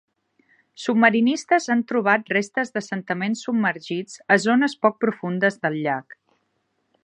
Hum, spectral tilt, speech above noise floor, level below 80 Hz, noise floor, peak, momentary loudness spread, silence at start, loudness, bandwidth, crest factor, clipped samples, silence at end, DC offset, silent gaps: none; -5 dB/octave; 50 dB; -76 dBFS; -72 dBFS; -2 dBFS; 11 LU; 0.8 s; -22 LUFS; 10 kHz; 20 dB; under 0.1%; 1 s; under 0.1%; none